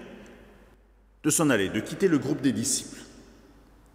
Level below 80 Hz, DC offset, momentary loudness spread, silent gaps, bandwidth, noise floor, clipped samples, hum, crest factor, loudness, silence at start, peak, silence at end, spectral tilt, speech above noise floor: -58 dBFS; under 0.1%; 22 LU; none; 16 kHz; -58 dBFS; under 0.1%; none; 18 dB; -25 LUFS; 0 s; -10 dBFS; 0.7 s; -4 dB/octave; 33 dB